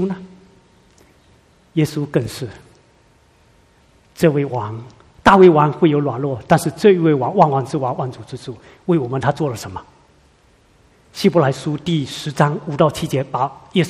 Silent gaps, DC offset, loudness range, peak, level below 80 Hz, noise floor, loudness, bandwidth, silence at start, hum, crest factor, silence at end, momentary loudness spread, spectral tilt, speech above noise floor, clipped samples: none; under 0.1%; 12 LU; 0 dBFS; -48 dBFS; -53 dBFS; -17 LUFS; 14.5 kHz; 0 s; none; 18 dB; 0 s; 18 LU; -6.5 dB/octave; 37 dB; under 0.1%